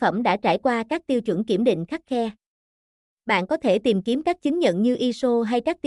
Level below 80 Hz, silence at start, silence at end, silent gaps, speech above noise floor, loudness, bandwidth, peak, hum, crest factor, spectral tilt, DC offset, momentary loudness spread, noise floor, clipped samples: -62 dBFS; 0 s; 0.1 s; 2.46-3.17 s; over 68 dB; -23 LUFS; 11.5 kHz; -8 dBFS; none; 16 dB; -6 dB/octave; under 0.1%; 6 LU; under -90 dBFS; under 0.1%